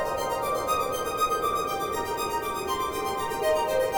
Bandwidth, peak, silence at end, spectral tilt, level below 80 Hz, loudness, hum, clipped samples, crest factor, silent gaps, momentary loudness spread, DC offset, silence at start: over 20 kHz; -14 dBFS; 0 s; -3 dB/octave; -50 dBFS; -27 LUFS; none; under 0.1%; 14 dB; none; 4 LU; under 0.1%; 0 s